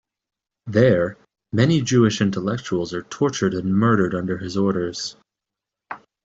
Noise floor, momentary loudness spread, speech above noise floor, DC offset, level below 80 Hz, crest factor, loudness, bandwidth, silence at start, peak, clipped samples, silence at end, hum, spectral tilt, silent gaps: -86 dBFS; 13 LU; 66 dB; under 0.1%; -56 dBFS; 18 dB; -21 LUFS; 8 kHz; 0.65 s; -4 dBFS; under 0.1%; 0.25 s; none; -6 dB/octave; none